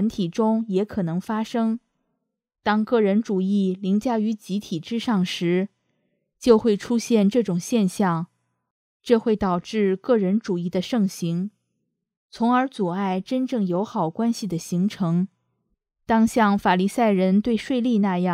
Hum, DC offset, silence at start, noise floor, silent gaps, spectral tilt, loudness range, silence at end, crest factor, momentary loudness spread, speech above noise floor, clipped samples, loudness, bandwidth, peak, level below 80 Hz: none; under 0.1%; 0 s; -77 dBFS; 8.70-9.00 s, 12.17-12.29 s; -6.5 dB/octave; 3 LU; 0 s; 20 dB; 8 LU; 56 dB; under 0.1%; -23 LUFS; 14.5 kHz; -2 dBFS; -58 dBFS